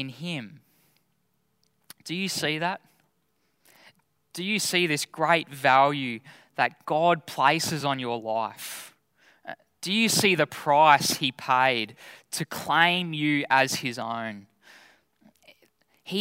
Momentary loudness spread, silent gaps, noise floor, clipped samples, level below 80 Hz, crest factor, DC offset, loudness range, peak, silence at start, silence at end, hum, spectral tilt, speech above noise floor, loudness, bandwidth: 17 LU; none; -73 dBFS; under 0.1%; -72 dBFS; 22 dB; under 0.1%; 10 LU; -4 dBFS; 0 s; 0 s; none; -3 dB/octave; 48 dB; -24 LUFS; 16 kHz